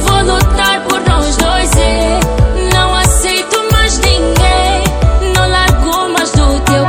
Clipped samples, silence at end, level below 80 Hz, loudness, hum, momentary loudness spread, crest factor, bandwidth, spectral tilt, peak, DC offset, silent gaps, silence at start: under 0.1%; 0 s; -14 dBFS; -10 LUFS; none; 3 LU; 10 dB; over 20 kHz; -4 dB/octave; 0 dBFS; under 0.1%; none; 0 s